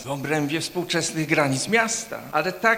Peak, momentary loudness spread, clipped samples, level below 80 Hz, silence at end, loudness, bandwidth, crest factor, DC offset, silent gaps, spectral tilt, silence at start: -4 dBFS; 6 LU; under 0.1%; -60 dBFS; 0 s; -23 LUFS; 17.5 kHz; 20 dB; under 0.1%; none; -3.5 dB/octave; 0 s